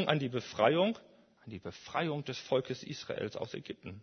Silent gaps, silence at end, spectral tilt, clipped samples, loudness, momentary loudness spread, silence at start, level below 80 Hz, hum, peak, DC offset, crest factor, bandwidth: none; 0 s; -5.5 dB/octave; under 0.1%; -34 LUFS; 17 LU; 0 s; -72 dBFS; none; -12 dBFS; under 0.1%; 24 dB; 6.6 kHz